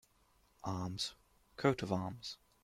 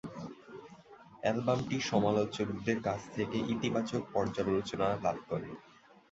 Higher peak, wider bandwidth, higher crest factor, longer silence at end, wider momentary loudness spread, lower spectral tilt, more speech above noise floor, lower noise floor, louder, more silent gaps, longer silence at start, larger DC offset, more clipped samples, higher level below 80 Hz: about the same, -16 dBFS vs -14 dBFS; first, 15.5 kHz vs 8 kHz; about the same, 24 dB vs 20 dB; second, 0.3 s vs 0.5 s; second, 13 LU vs 16 LU; about the same, -5.5 dB/octave vs -6 dB/octave; first, 34 dB vs 23 dB; first, -72 dBFS vs -56 dBFS; second, -39 LUFS vs -33 LUFS; neither; first, 0.65 s vs 0.05 s; neither; neither; second, -68 dBFS vs -62 dBFS